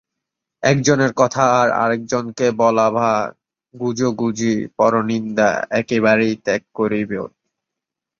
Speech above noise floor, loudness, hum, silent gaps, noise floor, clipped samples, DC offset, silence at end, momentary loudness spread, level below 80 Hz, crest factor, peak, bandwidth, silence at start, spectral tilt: 66 dB; -18 LUFS; none; none; -84 dBFS; under 0.1%; under 0.1%; 0.9 s; 8 LU; -58 dBFS; 18 dB; -2 dBFS; 7.6 kHz; 0.6 s; -5.5 dB/octave